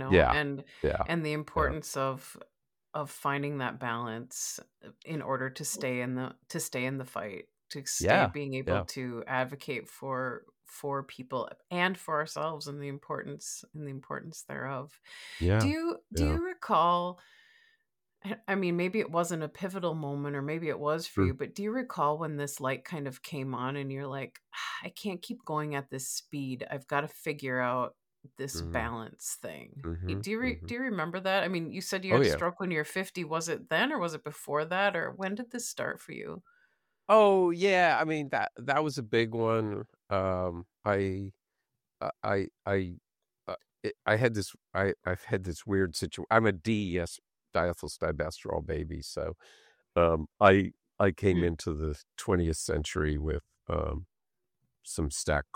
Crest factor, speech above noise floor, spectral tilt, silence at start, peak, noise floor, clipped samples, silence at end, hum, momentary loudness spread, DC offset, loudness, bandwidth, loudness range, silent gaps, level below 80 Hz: 24 dB; 58 dB; -5 dB/octave; 0 s; -8 dBFS; -89 dBFS; under 0.1%; 0.1 s; none; 14 LU; under 0.1%; -31 LUFS; 19 kHz; 8 LU; none; -50 dBFS